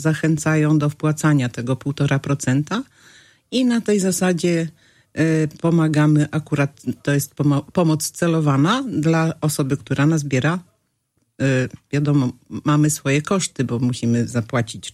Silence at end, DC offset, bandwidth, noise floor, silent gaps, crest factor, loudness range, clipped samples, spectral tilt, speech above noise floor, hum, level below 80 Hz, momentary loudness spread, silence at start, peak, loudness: 0.05 s; under 0.1%; 14.5 kHz; -69 dBFS; none; 14 dB; 2 LU; under 0.1%; -6 dB/octave; 50 dB; none; -56 dBFS; 7 LU; 0 s; -4 dBFS; -20 LUFS